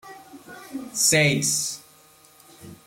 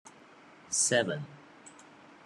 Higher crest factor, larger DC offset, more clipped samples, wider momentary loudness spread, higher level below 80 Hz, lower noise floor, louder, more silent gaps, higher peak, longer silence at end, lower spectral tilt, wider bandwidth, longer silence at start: about the same, 20 dB vs 22 dB; neither; neither; about the same, 25 LU vs 26 LU; first, -62 dBFS vs -78 dBFS; about the same, -54 dBFS vs -56 dBFS; first, -20 LUFS vs -29 LUFS; neither; first, -6 dBFS vs -12 dBFS; second, 0.1 s vs 0.45 s; about the same, -2.5 dB/octave vs -2 dB/octave; first, 16.5 kHz vs 12 kHz; second, 0.05 s vs 0.7 s